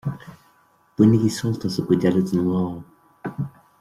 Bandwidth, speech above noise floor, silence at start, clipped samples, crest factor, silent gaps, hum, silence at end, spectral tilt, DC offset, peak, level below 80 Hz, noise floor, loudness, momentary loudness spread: 14.5 kHz; 40 dB; 0.05 s; under 0.1%; 18 dB; none; none; 0.3 s; -7.5 dB/octave; under 0.1%; -4 dBFS; -56 dBFS; -59 dBFS; -21 LUFS; 19 LU